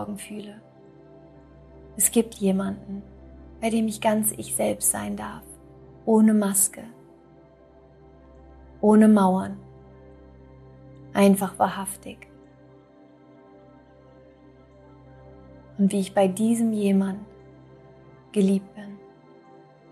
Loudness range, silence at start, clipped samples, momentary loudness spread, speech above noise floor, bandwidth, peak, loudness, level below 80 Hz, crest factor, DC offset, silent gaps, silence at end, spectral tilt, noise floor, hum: 5 LU; 0 s; under 0.1%; 23 LU; 30 dB; 14.5 kHz; -6 dBFS; -22 LUFS; -56 dBFS; 20 dB; under 0.1%; none; 0.95 s; -5 dB/octave; -52 dBFS; none